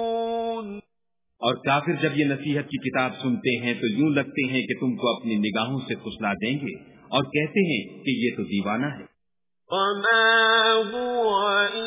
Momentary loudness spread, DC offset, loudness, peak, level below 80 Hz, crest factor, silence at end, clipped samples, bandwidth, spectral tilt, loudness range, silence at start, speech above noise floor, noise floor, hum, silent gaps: 11 LU; under 0.1%; -24 LUFS; -8 dBFS; -64 dBFS; 18 dB; 0 s; under 0.1%; 3.9 kHz; -9 dB/octave; 4 LU; 0 s; 63 dB; -87 dBFS; none; none